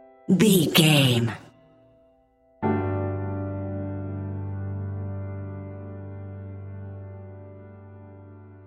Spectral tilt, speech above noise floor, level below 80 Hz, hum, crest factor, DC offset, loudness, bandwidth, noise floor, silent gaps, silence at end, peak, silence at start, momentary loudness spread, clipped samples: -5 dB/octave; 42 dB; -62 dBFS; none; 22 dB; under 0.1%; -24 LUFS; 16 kHz; -61 dBFS; none; 0 s; -4 dBFS; 0.3 s; 27 LU; under 0.1%